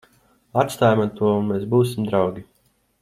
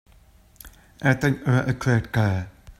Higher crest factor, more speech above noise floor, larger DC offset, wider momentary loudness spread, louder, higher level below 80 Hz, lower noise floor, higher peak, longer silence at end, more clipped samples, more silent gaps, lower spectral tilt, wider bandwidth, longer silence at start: about the same, 18 dB vs 20 dB; first, 39 dB vs 32 dB; neither; first, 7 LU vs 4 LU; about the same, -21 LUFS vs -23 LUFS; second, -58 dBFS vs -48 dBFS; first, -59 dBFS vs -54 dBFS; about the same, -2 dBFS vs -4 dBFS; first, 0.6 s vs 0.1 s; neither; neither; about the same, -7 dB/octave vs -7 dB/octave; about the same, 15.5 kHz vs 15 kHz; about the same, 0.55 s vs 0.65 s